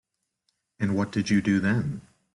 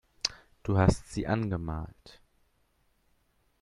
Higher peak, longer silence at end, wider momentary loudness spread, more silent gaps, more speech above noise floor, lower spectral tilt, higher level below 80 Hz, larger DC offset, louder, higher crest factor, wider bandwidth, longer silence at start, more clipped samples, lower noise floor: second, -12 dBFS vs -8 dBFS; second, 0.35 s vs 1.5 s; second, 10 LU vs 14 LU; neither; first, 52 dB vs 42 dB; about the same, -6.5 dB/octave vs -6 dB/octave; second, -58 dBFS vs -46 dBFS; neither; first, -26 LUFS vs -31 LUFS; second, 14 dB vs 26 dB; about the same, 11 kHz vs 11.5 kHz; first, 0.8 s vs 0.25 s; neither; first, -77 dBFS vs -71 dBFS